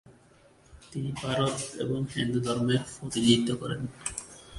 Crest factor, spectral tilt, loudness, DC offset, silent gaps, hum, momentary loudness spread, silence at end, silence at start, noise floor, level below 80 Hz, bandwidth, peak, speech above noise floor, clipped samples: 22 dB; -5 dB/octave; -29 LUFS; under 0.1%; none; none; 12 LU; 0 s; 0.1 s; -59 dBFS; -56 dBFS; 11.5 kHz; -8 dBFS; 30 dB; under 0.1%